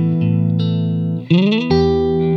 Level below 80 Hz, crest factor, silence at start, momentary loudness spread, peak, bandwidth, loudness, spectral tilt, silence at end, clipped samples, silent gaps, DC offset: -38 dBFS; 12 dB; 0 s; 4 LU; -4 dBFS; 6.2 kHz; -16 LUFS; -9 dB/octave; 0 s; under 0.1%; none; under 0.1%